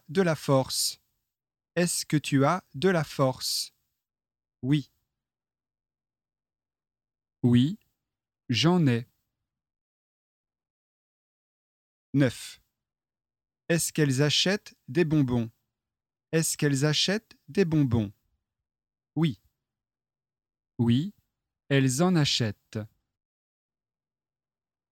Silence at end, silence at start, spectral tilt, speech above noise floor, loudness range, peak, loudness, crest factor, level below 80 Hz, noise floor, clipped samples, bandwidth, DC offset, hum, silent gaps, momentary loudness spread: 2.05 s; 0.1 s; -5 dB/octave; over 65 dB; 8 LU; -10 dBFS; -26 LUFS; 20 dB; -62 dBFS; under -90 dBFS; under 0.1%; 17 kHz; under 0.1%; none; 9.81-10.44 s, 10.70-12.13 s; 14 LU